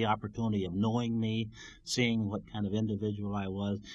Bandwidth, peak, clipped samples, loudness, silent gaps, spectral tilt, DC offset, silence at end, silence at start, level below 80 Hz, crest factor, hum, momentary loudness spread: 11.5 kHz; -14 dBFS; under 0.1%; -33 LUFS; none; -6 dB/octave; under 0.1%; 0 s; 0 s; -58 dBFS; 18 dB; none; 6 LU